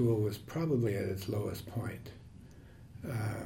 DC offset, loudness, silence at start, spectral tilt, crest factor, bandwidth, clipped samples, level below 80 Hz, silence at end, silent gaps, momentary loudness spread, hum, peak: under 0.1%; -36 LUFS; 0 s; -7.5 dB/octave; 16 dB; 16.5 kHz; under 0.1%; -60 dBFS; 0 s; none; 23 LU; none; -20 dBFS